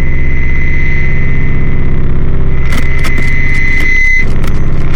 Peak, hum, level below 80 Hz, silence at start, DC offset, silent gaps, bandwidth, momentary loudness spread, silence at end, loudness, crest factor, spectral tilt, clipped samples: 0 dBFS; 50 Hz at -30 dBFS; -8 dBFS; 0 s; 4%; none; 6.4 kHz; 6 LU; 0 s; -13 LUFS; 4 dB; -6.5 dB/octave; under 0.1%